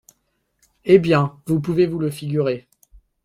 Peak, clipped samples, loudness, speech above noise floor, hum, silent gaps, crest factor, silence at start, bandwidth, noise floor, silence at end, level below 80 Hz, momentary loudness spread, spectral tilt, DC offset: 0 dBFS; under 0.1%; -19 LUFS; 52 dB; none; none; 20 dB; 0.85 s; 14 kHz; -70 dBFS; 0.65 s; -54 dBFS; 10 LU; -7.5 dB/octave; under 0.1%